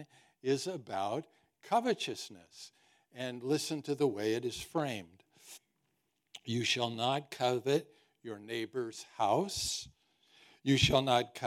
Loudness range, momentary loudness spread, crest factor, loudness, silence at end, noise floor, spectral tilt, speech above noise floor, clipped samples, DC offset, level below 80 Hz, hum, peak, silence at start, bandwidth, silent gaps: 3 LU; 21 LU; 24 dB; -34 LUFS; 0 s; -81 dBFS; -4.5 dB/octave; 46 dB; under 0.1%; under 0.1%; -62 dBFS; none; -12 dBFS; 0 s; 16 kHz; none